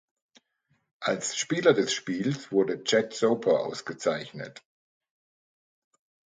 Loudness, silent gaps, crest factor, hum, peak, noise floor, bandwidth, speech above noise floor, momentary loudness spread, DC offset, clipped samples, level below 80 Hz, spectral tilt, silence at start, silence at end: -27 LUFS; none; 22 dB; none; -8 dBFS; -73 dBFS; 9.6 kHz; 46 dB; 11 LU; under 0.1%; under 0.1%; -74 dBFS; -4 dB/octave; 1 s; 1.8 s